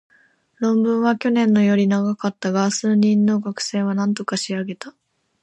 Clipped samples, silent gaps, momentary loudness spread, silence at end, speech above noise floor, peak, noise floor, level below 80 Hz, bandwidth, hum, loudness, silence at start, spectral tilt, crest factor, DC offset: under 0.1%; none; 9 LU; 0.55 s; 39 dB; -6 dBFS; -58 dBFS; -68 dBFS; 9 kHz; none; -19 LUFS; 0.6 s; -5.5 dB/octave; 14 dB; under 0.1%